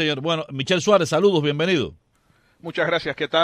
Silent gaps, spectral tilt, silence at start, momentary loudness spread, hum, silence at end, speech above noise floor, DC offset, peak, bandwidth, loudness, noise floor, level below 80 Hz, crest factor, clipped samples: none; -5 dB/octave; 0 s; 10 LU; none; 0 s; 41 dB; under 0.1%; -4 dBFS; 13.5 kHz; -21 LUFS; -61 dBFS; -58 dBFS; 16 dB; under 0.1%